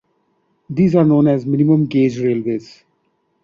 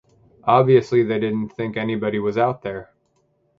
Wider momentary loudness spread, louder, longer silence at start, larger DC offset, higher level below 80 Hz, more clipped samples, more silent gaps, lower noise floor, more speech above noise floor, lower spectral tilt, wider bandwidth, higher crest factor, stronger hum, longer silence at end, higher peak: about the same, 11 LU vs 13 LU; first, -16 LUFS vs -20 LUFS; first, 0.7 s vs 0.45 s; neither; about the same, -54 dBFS vs -58 dBFS; neither; neither; about the same, -65 dBFS vs -65 dBFS; first, 51 dB vs 46 dB; first, -9.5 dB/octave vs -8 dB/octave; about the same, 7.2 kHz vs 7.4 kHz; second, 14 dB vs 20 dB; neither; about the same, 0.8 s vs 0.75 s; about the same, -2 dBFS vs -2 dBFS